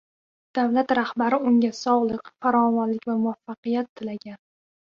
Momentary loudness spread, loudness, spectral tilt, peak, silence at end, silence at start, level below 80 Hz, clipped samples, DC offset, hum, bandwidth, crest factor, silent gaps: 13 LU; -23 LUFS; -6 dB/octave; -8 dBFS; 0.6 s; 0.55 s; -68 dBFS; under 0.1%; under 0.1%; none; 7.2 kHz; 16 dB; 3.58-3.63 s, 3.89-3.96 s